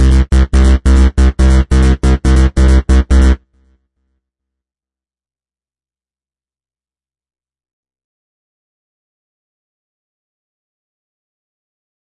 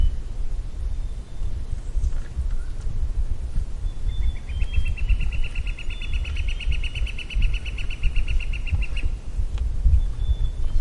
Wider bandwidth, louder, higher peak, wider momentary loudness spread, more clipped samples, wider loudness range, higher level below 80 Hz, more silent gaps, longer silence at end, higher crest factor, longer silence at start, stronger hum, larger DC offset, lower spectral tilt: about the same, 11 kHz vs 10 kHz; first, -11 LUFS vs -29 LUFS; first, 0 dBFS vs -8 dBFS; second, 2 LU vs 7 LU; neither; first, 8 LU vs 4 LU; first, -14 dBFS vs -24 dBFS; neither; first, 8.7 s vs 0 s; about the same, 12 dB vs 14 dB; about the same, 0 s vs 0 s; neither; neither; first, -7 dB/octave vs -5.5 dB/octave